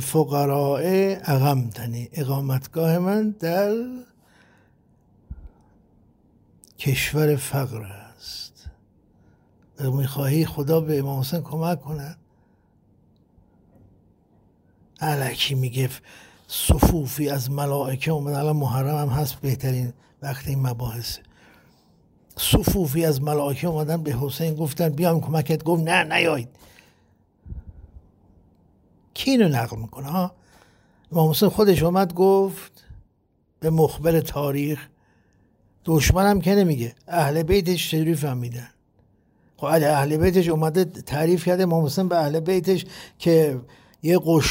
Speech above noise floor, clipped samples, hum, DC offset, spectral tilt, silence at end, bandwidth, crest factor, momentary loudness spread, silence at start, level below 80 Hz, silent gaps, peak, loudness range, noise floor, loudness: 44 dB; under 0.1%; none; under 0.1%; -6 dB/octave; 0 s; 16.5 kHz; 20 dB; 15 LU; 0 s; -40 dBFS; none; -4 dBFS; 7 LU; -65 dBFS; -22 LUFS